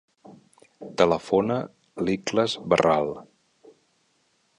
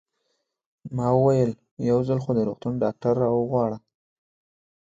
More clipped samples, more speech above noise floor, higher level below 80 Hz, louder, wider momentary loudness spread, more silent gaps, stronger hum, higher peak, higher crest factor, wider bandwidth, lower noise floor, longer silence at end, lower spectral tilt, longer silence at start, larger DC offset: neither; second, 45 dB vs 53 dB; about the same, -58 dBFS vs -58 dBFS; about the same, -24 LUFS vs -24 LUFS; first, 18 LU vs 8 LU; second, none vs 1.71-1.77 s; neither; first, -4 dBFS vs -8 dBFS; about the same, 22 dB vs 18 dB; first, 11 kHz vs 7.8 kHz; second, -68 dBFS vs -76 dBFS; first, 1.35 s vs 1.1 s; second, -5.5 dB/octave vs -9.5 dB/octave; second, 0.3 s vs 0.85 s; neither